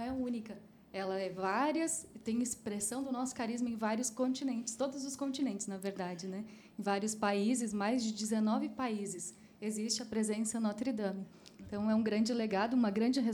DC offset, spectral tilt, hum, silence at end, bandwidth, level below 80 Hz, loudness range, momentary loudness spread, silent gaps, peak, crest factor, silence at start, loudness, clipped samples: under 0.1%; -4 dB/octave; none; 0 s; 19 kHz; -72 dBFS; 3 LU; 11 LU; none; -20 dBFS; 16 dB; 0 s; -36 LUFS; under 0.1%